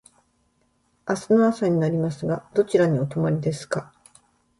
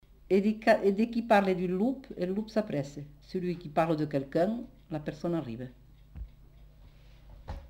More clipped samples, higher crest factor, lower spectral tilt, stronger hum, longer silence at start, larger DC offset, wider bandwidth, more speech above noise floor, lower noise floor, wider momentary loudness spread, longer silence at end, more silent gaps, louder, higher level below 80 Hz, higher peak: neither; about the same, 16 dB vs 20 dB; about the same, -7.5 dB/octave vs -7.5 dB/octave; neither; first, 1.05 s vs 0.3 s; neither; second, 11.5 kHz vs 16 kHz; first, 45 dB vs 25 dB; first, -67 dBFS vs -54 dBFS; second, 10 LU vs 20 LU; first, 0.75 s vs 0 s; neither; first, -23 LUFS vs -30 LUFS; second, -60 dBFS vs -54 dBFS; first, -8 dBFS vs -12 dBFS